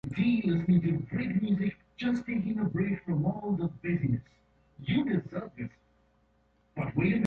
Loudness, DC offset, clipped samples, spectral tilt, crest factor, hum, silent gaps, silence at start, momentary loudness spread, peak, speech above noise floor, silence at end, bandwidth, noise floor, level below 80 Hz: -30 LUFS; under 0.1%; under 0.1%; -9 dB/octave; 16 dB; none; none; 0.05 s; 12 LU; -16 dBFS; 39 dB; 0 s; 6 kHz; -68 dBFS; -56 dBFS